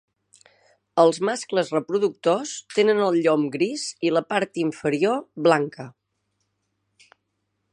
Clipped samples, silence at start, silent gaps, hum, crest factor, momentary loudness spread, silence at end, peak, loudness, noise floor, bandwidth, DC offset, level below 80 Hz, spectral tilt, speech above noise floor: under 0.1%; 0.95 s; none; 50 Hz at -60 dBFS; 22 dB; 7 LU; 1.85 s; -2 dBFS; -22 LUFS; -76 dBFS; 11 kHz; under 0.1%; -74 dBFS; -5 dB/octave; 54 dB